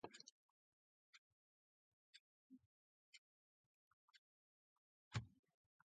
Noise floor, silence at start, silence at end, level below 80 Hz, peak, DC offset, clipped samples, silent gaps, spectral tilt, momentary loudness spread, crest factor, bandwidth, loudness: under -90 dBFS; 0.05 s; 0.6 s; -78 dBFS; -34 dBFS; under 0.1%; under 0.1%; 0.32-2.13 s, 2.20-2.50 s, 2.66-3.12 s, 3.18-4.08 s, 4.18-5.11 s; -4.5 dB/octave; 17 LU; 28 dB; 7.4 kHz; -55 LUFS